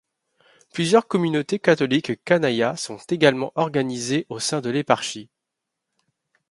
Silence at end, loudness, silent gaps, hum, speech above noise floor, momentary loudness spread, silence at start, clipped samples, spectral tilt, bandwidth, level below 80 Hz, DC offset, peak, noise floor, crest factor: 1.25 s; -22 LUFS; none; none; 61 dB; 8 LU; 0.75 s; under 0.1%; -4.5 dB/octave; 11.5 kHz; -66 dBFS; under 0.1%; -2 dBFS; -82 dBFS; 22 dB